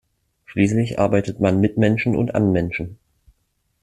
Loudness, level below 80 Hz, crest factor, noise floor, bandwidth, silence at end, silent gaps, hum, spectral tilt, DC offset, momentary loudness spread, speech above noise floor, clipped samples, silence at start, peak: -20 LUFS; -48 dBFS; 18 dB; -69 dBFS; 10.5 kHz; 0.9 s; none; none; -7.5 dB/octave; under 0.1%; 9 LU; 50 dB; under 0.1%; 0.5 s; -2 dBFS